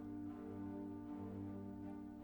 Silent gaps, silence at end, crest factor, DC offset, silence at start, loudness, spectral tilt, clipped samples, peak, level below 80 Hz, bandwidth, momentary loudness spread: none; 0 s; 12 dB; under 0.1%; 0 s; -50 LUFS; -9.5 dB/octave; under 0.1%; -38 dBFS; -70 dBFS; 19 kHz; 2 LU